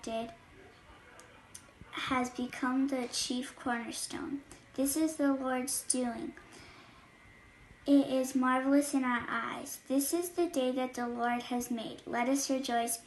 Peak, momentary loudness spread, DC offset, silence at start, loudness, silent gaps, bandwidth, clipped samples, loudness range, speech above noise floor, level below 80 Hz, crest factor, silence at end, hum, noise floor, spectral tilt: -14 dBFS; 16 LU; under 0.1%; 0.05 s; -33 LUFS; none; 12.5 kHz; under 0.1%; 4 LU; 25 dB; -66 dBFS; 20 dB; 0 s; none; -58 dBFS; -2.5 dB/octave